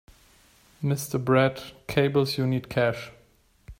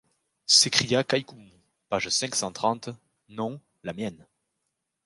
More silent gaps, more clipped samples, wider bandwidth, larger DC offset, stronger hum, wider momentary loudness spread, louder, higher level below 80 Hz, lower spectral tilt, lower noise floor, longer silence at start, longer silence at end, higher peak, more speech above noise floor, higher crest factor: neither; neither; first, 16 kHz vs 11.5 kHz; neither; neither; second, 13 LU vs 21 LU; about the same, -25 LUFS vs -24 LUFS; first, -54 dBFS vs -66 dBFS; first, -6 dB/octave vs -2 dB/octave; second, -61 dBFS vs -81 dBFS; first, 0.8 s vs 0.5 s; second, 0.05 s vs 0.9 s; second, -8 dBFS vs -2 dBFS; second, 36 dB vs 54 dB; second, 20 dB vs 26 dB